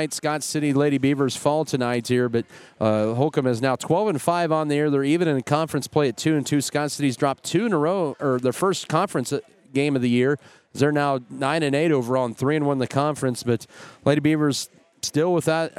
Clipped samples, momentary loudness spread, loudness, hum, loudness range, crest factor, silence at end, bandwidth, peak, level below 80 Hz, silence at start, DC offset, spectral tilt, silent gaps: under 0.1%; 6 LU; -23 LUFS; none; 1 LU; 18 dB; 0.1 s; 15.5 kHz; -4 dBFS; -64 dBFS; 0 s; under 0.1%; -5.5 dB/octave; none